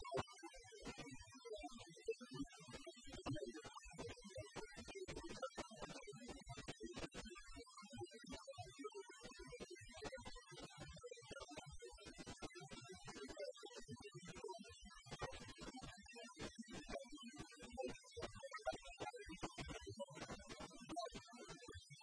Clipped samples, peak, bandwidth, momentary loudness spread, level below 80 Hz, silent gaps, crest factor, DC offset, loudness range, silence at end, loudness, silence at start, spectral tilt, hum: under 0.1%; -30 dBFS; 11 kHz; 7 LU; -66 dBFS; none; 24 dB; under 0.1%; 4 LU; 0 s; -54 LUFS; 0 s; -4 dB/octave; none